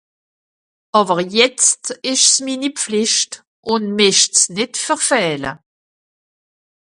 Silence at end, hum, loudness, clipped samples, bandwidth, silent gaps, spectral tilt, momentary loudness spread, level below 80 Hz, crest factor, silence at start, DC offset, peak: 1.25 s; none; -15 LUFS; under 0.1%; 11.5 kHz; 3.47-3.63 s; -1.5 dB/octave; 10 LU; -62 dBFS; 18 dB; 0.95 s; under 0.1%; 0 dBFS